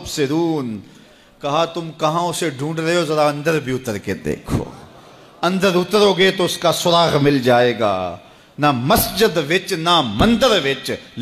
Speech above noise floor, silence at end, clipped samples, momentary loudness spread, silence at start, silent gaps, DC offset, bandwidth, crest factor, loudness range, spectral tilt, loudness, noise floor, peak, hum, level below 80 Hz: 26 dB; 0 s; under 0.1%; 10 LU; 0 s; none; under 0.1%; 15.5 kHz; 14 dB; 5 LU; -4.5 dB/octave; -17 LUFS; -43 dBFS; -4 dBFS; none; -42 dBFS